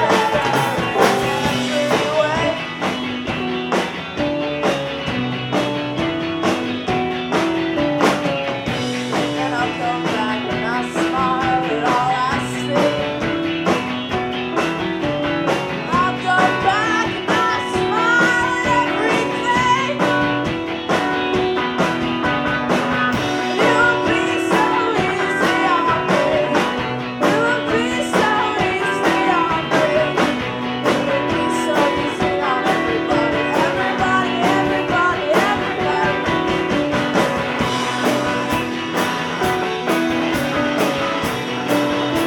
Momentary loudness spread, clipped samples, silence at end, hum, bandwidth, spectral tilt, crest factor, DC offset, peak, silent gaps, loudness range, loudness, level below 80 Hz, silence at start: 5 LU; under 0.1%; 0 s; none; 19 kHz; -4.5 dB/octave; 18 dB; under 0.1%; 0 dBFS; none; 3 LU; -18 LUFS; -46 dBFS; 0 s